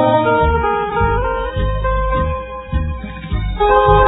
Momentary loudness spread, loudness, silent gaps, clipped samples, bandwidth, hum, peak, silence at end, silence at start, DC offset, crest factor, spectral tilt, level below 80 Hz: 11 LU; -17 LUFS; none; under 0.1%; 4 kHz; none; 0 dBFS; 0 s; 0 s; under 0.1%; 16 dB; -10.5 dB/octave; -22 dBFS